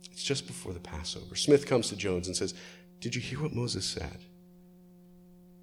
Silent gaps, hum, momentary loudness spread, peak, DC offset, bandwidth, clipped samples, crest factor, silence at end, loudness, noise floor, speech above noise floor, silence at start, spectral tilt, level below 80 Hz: none; none; 16 LU; -10 dBFS; under 0.1%; 14 kHz; under 0.1%; 22 dB; 0 s; -32 LUFS; -56 dBFS; 24 dB; 0 s; -4 dB/octave; -54 dBFS